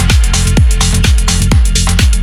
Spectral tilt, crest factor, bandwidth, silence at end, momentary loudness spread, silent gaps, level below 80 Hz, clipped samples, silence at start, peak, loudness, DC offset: -4 dB/octave; 8 dB; 15 kHz; 0 s; 1 LU; none; -10 dBFS; under 0.1%; 0 s; 0 dBFS; -10 LUFS; under 0.1%